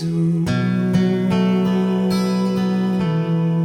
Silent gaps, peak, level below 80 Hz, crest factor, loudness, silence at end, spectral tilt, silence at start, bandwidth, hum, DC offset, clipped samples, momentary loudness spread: none; -6 dBFS; -50 dBFS; 12 dB; -19 LUFS; 0 s; -8 dB/octave; 0 s; 12 kHz; none; under 0.1%; under 0.1%; 2 LU